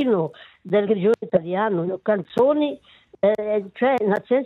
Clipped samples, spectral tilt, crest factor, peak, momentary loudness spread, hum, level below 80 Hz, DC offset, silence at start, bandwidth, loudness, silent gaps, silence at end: under 0.1%; -8 dB/octave; 16 dB; -6 dBFS; 5 LU; none; -66 dBFS; under 0.1%; 0 s; 7 kHz; -22 LUFS; none; 0 s